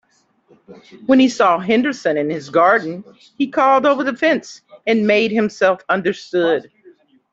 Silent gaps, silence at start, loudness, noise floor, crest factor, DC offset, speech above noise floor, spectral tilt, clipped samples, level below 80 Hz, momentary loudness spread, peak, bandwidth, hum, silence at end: none; 0.7 s; -16 LUFS; -49 dBFS; 14 dB; under 0.1%; 33 dB; -5 dB/octave; under 0.1%; -64 dBFS; 9 LU; -2 dBFS; 7.8 kHz; none; 0.7 s